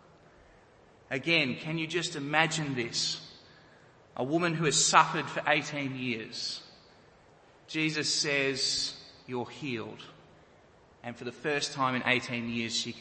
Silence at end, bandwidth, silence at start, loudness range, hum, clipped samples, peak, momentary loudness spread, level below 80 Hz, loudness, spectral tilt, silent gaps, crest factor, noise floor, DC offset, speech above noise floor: 0 s; 8.8 kHz; 1.1 s; 5 LU; none; under 0.1%; -6 dBFS; 15 LU; -68 dBFS; -29 LUFS; -3 dB/octave; none; 26 dB; -59 dBFS; under 0.1%; 29 dB